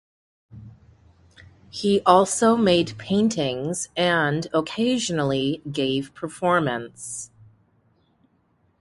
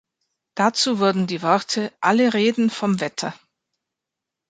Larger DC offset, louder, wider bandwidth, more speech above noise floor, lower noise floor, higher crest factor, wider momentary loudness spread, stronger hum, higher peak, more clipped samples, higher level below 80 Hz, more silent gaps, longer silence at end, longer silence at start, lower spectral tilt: neither; about the same, -22 LUFS vs -20 LUFS; first, 11.5 kHz vs 9.4 kHz; second, 43 dB vs 65 dB; second, -65 dBFS vs -85 dBFS; about the same, 24 dB vs 20 dB; first, 16 LU vs 9 LU; neither; about the same, 0 dBFS vs -2 dBFS; neither; first, -58 dBFS vs -68 dBFS; neither; first, 1.55 s vs 1.15 s; about the same, 0.55 s vs 0.55 s; about the same, -4.5 dB/octave vs -4.5 dB/octave